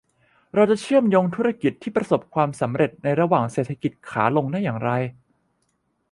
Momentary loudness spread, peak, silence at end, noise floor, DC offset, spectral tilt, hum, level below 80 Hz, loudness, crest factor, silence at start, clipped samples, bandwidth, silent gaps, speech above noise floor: 8 LU; -4 dBFS; 1 s; -70 dBFS; under 0.1%; -7.5 dB/octave; none; -62 dBFS; -22 LUFS; 18 dB; 0.55 s; under 0.1%; 11.5 kHz; none; 49 dB